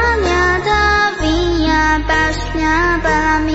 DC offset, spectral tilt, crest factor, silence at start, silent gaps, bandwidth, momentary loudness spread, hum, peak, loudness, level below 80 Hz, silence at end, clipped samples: under 0.1%; -5 dB/octave; 12 dB; 0 s; none; 8 kHz; 3 LU; none; -2 dBFS; -14 LUFS; -24 dBFS; 0 s; under 0.1%